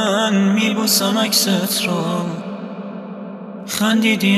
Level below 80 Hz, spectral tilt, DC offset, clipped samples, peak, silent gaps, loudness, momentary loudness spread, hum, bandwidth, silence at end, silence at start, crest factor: -64 dBFS; -3.5 dB/octave; under 0.1%; under 0.1%; -2 dBFS; none; -17 LUFS; 16 LU; none; 14.5 kHz; 0 s; 0 s; 16 dB